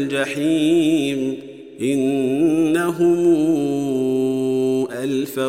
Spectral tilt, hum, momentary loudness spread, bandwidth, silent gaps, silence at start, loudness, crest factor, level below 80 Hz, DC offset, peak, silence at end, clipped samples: -6 dB/octave; none; 7 LU; 16 kHz; none; 0 s; -19 LUFS; 12 dB; -66 dBFS; 0.1%; -6 dBFS; 0 s; under 0.1%